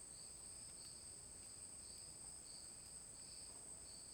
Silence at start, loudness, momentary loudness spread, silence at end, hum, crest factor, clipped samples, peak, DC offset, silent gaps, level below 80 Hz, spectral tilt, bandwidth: 0 s; -53 LUFS; 1 LU; 0 s; none; 14 dB; under 0.1%; -42 dBFS; under 0.1%; none; -72 dBFS; -1 dB/octave; over 20 kHz